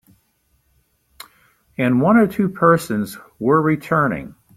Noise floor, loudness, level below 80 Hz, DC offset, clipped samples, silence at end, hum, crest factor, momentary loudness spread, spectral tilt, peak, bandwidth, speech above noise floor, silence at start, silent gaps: -64 dBFS; -18 LUFS; -54 dBFS; under 0.1%; under 0.1%; 0.3 s; none; 18 dB; 12 LU; -7.5 dB/octave; -2 dBFS; 15 kHz; 47 dB; 1.8 s; none